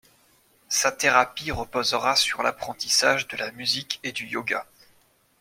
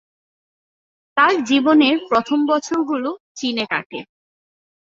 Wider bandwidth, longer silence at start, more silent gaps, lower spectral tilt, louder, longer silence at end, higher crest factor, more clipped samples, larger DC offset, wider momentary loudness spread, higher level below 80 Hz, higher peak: first, 16.5 kHz vs 7.8 kHz; second, 0.7 s vs 1.15 s; second, none vs 3.20-3.35 s, 3.86-3.90 s; second, -1 dB/octave vs -3.5 dB/octave; second, -23 LUFS vs -18 LUFS; about the same, 0.75 s vs 0.8 s; first, 24 dB vs 18 dB; neither; neither; about the same, 10 LU vs 11 LU; first, -54 dBFS vs -64 dBFS; about the same, -2 dBFS vs -2 dBFS